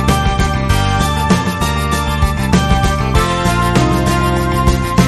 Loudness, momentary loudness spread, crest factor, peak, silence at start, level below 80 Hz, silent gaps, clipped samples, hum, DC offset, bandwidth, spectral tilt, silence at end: -14 LUFS; 3 LU; 12 dB; 0 dBFS; 0 s; -20 dBFS; none; under 0.1%; none; under 0.1%; 13.5 kHz; -5.5 dB/octave; 0 s